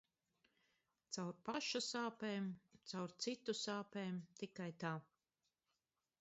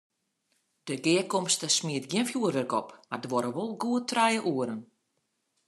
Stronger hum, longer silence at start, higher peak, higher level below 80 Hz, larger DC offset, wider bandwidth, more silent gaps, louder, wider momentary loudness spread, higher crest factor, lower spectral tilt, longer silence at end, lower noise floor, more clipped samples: neither; first, 1.1 s vs 0.85 s; second, -28 dBFS vs -10 dBFS; second, -88 dBFS vs -82 dBFS; neither; second, 8 kHz vs 13 kHz; neither; second, -46 LUFS vs -28 LUFS; second, 9 LU vs 12 LU; about the same, 20 dB vs 20 dB; about the same, -3.5 dB/octave vs -3.5 dB/octave; first, 1.2 s vs 0.85 s; first, under -90 dBFS vs -78 dBFS; neither